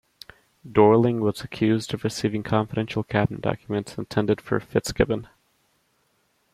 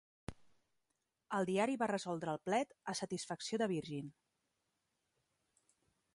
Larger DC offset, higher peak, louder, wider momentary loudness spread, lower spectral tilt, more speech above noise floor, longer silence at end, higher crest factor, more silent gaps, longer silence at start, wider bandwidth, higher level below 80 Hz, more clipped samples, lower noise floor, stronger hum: neither; first, -2 dBFS vs -22 dBFS; first, -24 LUFS vs -39 LUFS; second, 10 LU vs 16 LU; first, -6.5 dB/octave vs -5 dB/octave; about the same, 45 dB vs 48 dB; second, 1.3 s vs 2.05 s; about the same, 22 dB vs 20 dB; neither; first, 0.65 s vs 0.3 s; first, 14.5 kHz vs 11.5 kHz; first, -48 dBFS vs -72 dBFS; neither; second, -68 dBFS vs -87 dBFS; neither